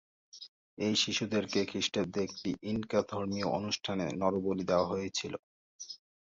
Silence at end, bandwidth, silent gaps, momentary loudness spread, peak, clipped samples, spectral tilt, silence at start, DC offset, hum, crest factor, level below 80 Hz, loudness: 0.25 s; 7.8 kHz; 0.48-0.77 s, 5.39-5.79 s; 16 LU; -14 dBFS; under 0.1%; -4 dB/octave; 0.35 s; under 0.1%; none; 20 dB; -62 dBFS; -33 LUFS